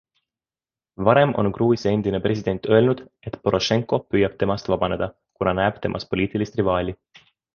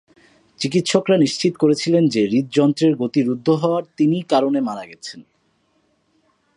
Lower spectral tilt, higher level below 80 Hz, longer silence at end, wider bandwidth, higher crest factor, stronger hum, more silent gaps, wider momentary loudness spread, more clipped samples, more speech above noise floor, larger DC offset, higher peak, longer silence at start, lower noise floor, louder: about the same, -6.5 dB/octave vs -6 dB/octave; first, -46 dBFS vs -66 dBFS; second, 0.6 s vs 1.35 s; second, 7 kHz vs 11 kHz; about the same, 20 dB vs 18 dB; neither; neither; about the same, 10 LU vs 10 LU; neither; first, over 69 dB vs 46 dB; neither; about the same, -2 dBFS vs -2 dBFS; first, 1 s vs 0.6 s; first, under -90 dBFS vs -64 dBFS; second, -22 LUFS vs -18 LUFS